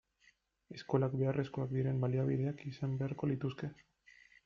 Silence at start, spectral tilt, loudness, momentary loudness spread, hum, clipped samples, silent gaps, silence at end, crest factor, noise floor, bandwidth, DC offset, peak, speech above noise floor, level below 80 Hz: 0.7 s; -9 dB/octave; -37 LUFS; 11 LU; none; under 0.1%; none; 0.7 s; 18 dB; -72 dBFS; 6.6 kHz; under 0.1%; -18 dBFS; 36 dB; -68 dBFS